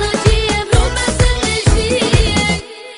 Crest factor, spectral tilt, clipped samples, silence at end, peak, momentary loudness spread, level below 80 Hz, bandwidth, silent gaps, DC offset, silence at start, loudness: 14 dB; -4.5 dB/octave; under 0.1%; 0 s; 0 dBFS; 3 LU; -18 dBFS; 11 kHz; none; under 0.1%; 0 s; -14 LUFS